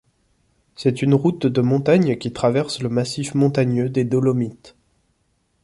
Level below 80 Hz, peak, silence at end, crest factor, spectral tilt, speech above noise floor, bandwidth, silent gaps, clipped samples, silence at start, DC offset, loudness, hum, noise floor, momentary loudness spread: -56 dBFS; -4 dBFS; 0.95 s; 18 dB; -7 dB/octave; 48 dB; 11.5 kHz; none; under 0.1%; 0.8 s; under 0.1%; -20 LUFS; none; -66 dBFS; 6 LU